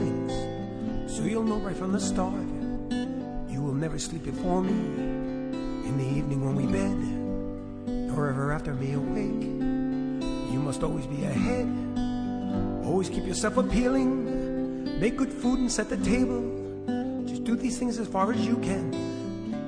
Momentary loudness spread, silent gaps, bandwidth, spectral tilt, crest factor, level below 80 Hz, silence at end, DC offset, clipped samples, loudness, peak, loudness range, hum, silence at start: 7 LU; none; 10.5 kHz; -6 dB/octave; 18 dB; -40 dBFS; 0 s; under 0.1%; under 0.1%; -29 LUFS; -10 dBFS; 3 LU; none; 0 s